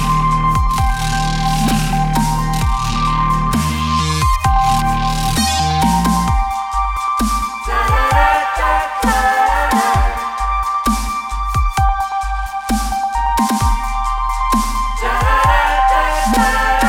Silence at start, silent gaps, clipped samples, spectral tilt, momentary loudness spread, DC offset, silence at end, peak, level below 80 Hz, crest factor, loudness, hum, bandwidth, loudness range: 0 s; none; under 0.1%; -4.5 dB/octave; 6 LU; under 0.1%; 0 s; 0 dBFS; -20 dBFS; 14 dB; -16 LUFS; none; 17 kHz; 3 LU